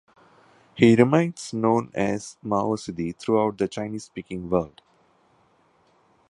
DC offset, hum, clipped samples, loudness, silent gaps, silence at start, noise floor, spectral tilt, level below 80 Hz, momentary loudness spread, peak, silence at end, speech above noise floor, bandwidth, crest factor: under 0.1%; none; under 0.1%; -23 LUFS; none; 0.75 s; -62 dBFS; -6.5 dB/octave; -56 dBFS; 16 LU; -2 dBFS; 1.6 s; 39 dB; 11.5 kHz; 24 dB